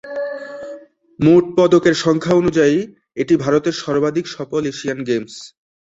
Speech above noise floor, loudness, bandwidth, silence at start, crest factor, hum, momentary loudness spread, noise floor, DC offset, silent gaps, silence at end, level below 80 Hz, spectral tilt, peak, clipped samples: 22 dB; -17 LUFS; 7.8 kHz; 0.05 s; 16 dB; none; 17 LU; -37 dBFS; under 0.1%; none; 0.4 s; -52 dBFS; -6 dB/octave; -2 dBFS; under 0.1%